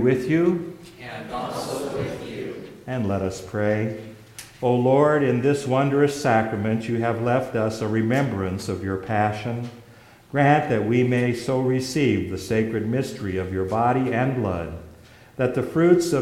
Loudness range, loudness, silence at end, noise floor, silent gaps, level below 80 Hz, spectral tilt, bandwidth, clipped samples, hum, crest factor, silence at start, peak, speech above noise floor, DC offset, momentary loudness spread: 6 LU; -23 LUFS; 0 s; -49 dBFS; none; -52 dBFS; -7 dB/octave; 16 kHz; under 0.1%; none; 18 dB; 0 s; -4 dBFS; 27 dB; under 0.1%; 14 LU